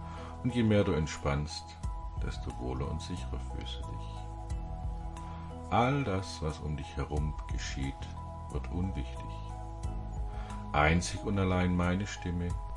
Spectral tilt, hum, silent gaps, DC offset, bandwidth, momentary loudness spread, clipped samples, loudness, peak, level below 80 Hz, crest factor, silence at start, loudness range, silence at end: -6 dB/octave; none; none; under 0.1%; 11.5 kHz; 14 LU; under 0.1%; -34 LUFS; -12 dBFS; -42 dBFS; 22 dB; 0 s; 7 LU; 0 s